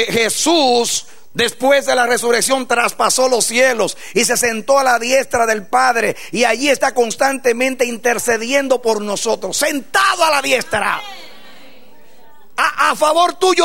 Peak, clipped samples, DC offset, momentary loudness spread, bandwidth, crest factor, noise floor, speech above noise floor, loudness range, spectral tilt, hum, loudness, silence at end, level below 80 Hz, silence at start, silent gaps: 0 dBFS; under 0.1%; 2%; 5 LU; 16.5 kHz; 14 dB; -48 dBFS; 33 dB; 3 LU; -1.5 dB/octave; none; -15 LUFS; 0 s; -56 dBFS; 0 s; none